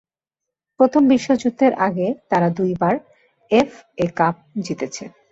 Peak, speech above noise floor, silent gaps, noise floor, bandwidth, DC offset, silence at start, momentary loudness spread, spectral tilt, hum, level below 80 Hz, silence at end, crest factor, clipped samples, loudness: -2 dBFS; 66 dB; none; -85 dBFS; 8 kHz; under 0.1%; 0.8 s; 11 LU; -6.5 dB/octave; none; -58 dBFS; 0.25 s; 16 dB; under 0.1%; -19 LUFS